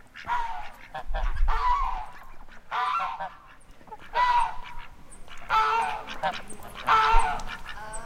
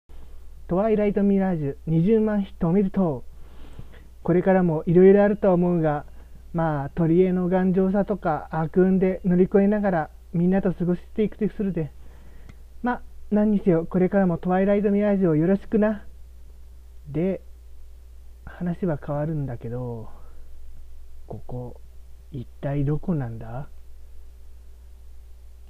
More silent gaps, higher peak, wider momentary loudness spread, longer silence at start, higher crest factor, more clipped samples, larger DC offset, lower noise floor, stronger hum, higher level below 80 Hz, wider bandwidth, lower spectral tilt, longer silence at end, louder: neither; about the same, -6 dBFS vs -6 dBFS; first, 21 LU vs 15 LU; about the same, 0.05 s vs 0.1 s; about the same, 20 dB vs 18 dB; neither; neither; first, -48 dBFS vs -43 dBFS; neither; first, -34 dBFS vs -42 dBFS; first, 12 kHz vs 4.1 kHz; second, -3 dB/octave vs -10.5 dB/octave; about the same, 0 s vs 0 s; second, -27 LUFS vs -23 LUFS